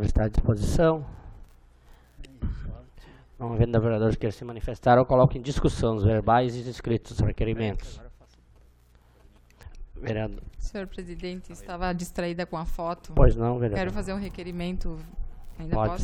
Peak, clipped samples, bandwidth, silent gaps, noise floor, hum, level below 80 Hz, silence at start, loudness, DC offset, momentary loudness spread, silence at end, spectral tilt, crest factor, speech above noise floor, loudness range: -4 dBFS; under 0.1%; 13 kHz; none; -57 dBFS; none; -32 dBFS; 0 s; -27 LUFS; under 0.1%; 19 LU; 0 s; -7.5 dB/octave; 22 dB; 32 dB; 12 LU